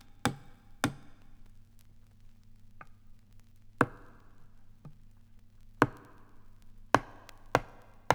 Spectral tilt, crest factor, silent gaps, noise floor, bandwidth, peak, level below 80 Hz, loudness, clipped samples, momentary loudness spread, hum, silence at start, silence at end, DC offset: -5 dB/octave; 34 dB; none; -55 dBFS; over 20 kHz; -4 dBFS; -54 dBFS; -33 LUFS; under 0.1%; 26 LU; none; 0.05 s; 0 s; under 0.1%